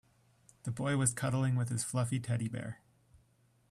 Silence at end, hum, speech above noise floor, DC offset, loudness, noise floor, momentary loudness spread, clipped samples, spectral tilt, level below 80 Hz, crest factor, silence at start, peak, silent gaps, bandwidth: 0.95 s; none; 36 dB; under 0.1%; -34 LUFS; -70 dBFS; 13 LU; under 0.1%; -5.5 dB/octave; -68 dBFS; 20 dB; 0.65 s; -16 dBFS; none; 13.5 kHz